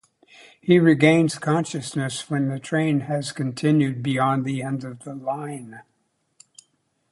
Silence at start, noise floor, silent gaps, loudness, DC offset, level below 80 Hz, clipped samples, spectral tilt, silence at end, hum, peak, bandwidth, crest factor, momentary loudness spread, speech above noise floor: 0.65 s; -71 dBFS; none; -22 LUFS; under 0.1%; -66 dBFS; under 0.1%; -6 dB/octave; 1.3 s; none; -2 dBFS; 11.5 kHz; 20 dB; 15 LU; 49 dB